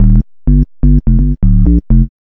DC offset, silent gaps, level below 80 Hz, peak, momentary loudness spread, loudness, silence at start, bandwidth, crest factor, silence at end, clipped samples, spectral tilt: under 0.1%; none; -10 dBFS; 0 dBFS; 3 LU; -12 LUFS; 0 s; 1.6 kHz; 8 dB; 0.15 s; 0.6%; -14 dB/octave